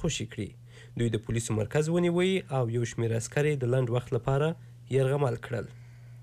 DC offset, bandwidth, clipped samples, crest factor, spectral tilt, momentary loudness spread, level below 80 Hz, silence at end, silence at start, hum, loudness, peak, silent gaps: under 0.1%; 13.5 kHz; under 0.1%; 14 dB; -6 dB/octave; 13 LU; -54 dBFS; 0 s; 0 s; none; -29 LUFS; -16 dBFS; none